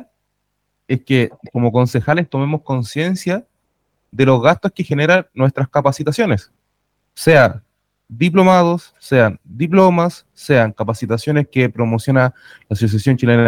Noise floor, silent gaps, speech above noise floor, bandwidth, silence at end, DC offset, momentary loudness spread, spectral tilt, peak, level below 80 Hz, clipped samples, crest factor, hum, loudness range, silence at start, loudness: -71 dBFS; none; 56 dB; 16 kHz; 0 s; under 0.1%; 10 LU; -7 dB/octave; 0 dBFS; -52 dBFS; under 0.1%; 16 dB; 50 Hz at -45 dBFS; 4 LU; 0 s; -16 LUFS